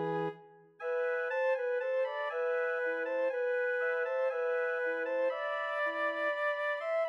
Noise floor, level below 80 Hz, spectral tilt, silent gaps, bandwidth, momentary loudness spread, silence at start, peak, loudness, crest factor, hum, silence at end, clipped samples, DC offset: -54 dBFS; under -90 dBFS; -5.5 dB/octave; none; 6.2 kHz; 3 LU; 0 s; -22 dBFS; -33 LUFS; 12 dB; none; 0 s; under 0.1%; under 0.1%